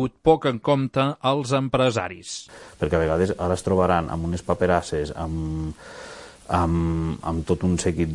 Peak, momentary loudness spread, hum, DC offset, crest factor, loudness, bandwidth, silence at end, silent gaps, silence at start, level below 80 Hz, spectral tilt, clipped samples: -4 dBFS; 14 LU; none; under 0.1%; 18 dB; -23 LUFS; 11.5 kHz; 0 s; none; 0 s; -42 dBFS; -6 dB/octave; under 0.1%